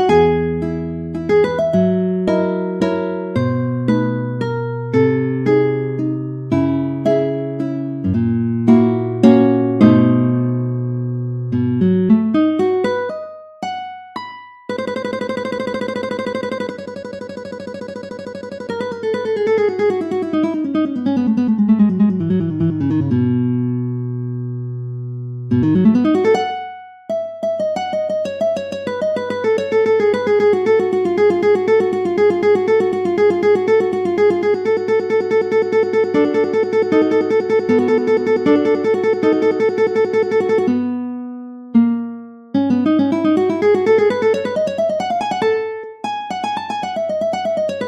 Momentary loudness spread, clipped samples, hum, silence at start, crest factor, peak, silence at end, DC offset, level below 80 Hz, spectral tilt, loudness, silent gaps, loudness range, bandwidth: 12 LU; under 0.1%; none; 0 s; 16 dB; 0 dBFS; 0 s; under 0.1%; -52 dBFS; -8 dB/octave; -17 LUFS; none; 7 LU; 8.8 kHz